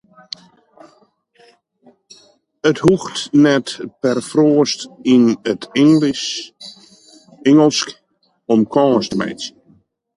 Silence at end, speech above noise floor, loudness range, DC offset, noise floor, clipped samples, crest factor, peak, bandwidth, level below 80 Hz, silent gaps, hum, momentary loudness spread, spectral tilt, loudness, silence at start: 0.65 s; 41 dB; 4 LU; under 0.1%; -56 dBFS; under 0.1%; 16 dB; -2 dBFS; 11.5 kHz; -56 dBFS; none; none; 21 LU; -5 dB/octave; -16 LUFS; 2.65 s